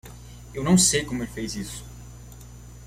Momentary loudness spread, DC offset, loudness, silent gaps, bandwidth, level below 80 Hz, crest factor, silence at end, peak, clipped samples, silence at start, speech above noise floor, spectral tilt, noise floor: 26 LU; under 0.1%; -23 LUFS; none; 16 kHz; -44 dBFS; 22 dB; 0 s; -6 dBFS; under 0.1%; 0.05 s; 20 dB; -3.5 dB/octave; -43 dBFS